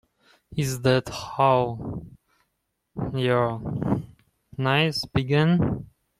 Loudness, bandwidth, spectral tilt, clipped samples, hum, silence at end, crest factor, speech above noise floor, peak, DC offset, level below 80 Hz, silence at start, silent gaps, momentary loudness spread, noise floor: -24 LUFS; 15.5 kHz; -6 dB/octave; under 0.1%; none; 0.35 s; 20 dB; 54 dB; -6 dBFS; under 0.1%; -50 dBFS; 0.5 s; none; 14 LU; -77 dBFS